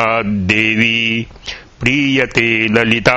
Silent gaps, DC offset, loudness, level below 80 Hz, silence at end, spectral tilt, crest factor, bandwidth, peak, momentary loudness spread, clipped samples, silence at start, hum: none; under 0.1%; -13 LUFS; -40 dBFS; 0 s; -5 dB/octave; 14 dB; 9.4 kHz; 0 dBFS; 11 LU; under 0.1%; 0 s; none